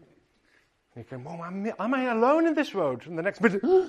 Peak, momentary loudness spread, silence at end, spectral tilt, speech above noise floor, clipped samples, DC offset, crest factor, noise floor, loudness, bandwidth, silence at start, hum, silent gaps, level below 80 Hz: -6 dBFS; 16 LU; 0 s; -7 dB/octave; 40 dB; under 0.1%; under 0.1%; 20 dB; -66 dBFS; -26 LUFS; 9.2 kHz; 0.95 s; none; none; -70 dBFS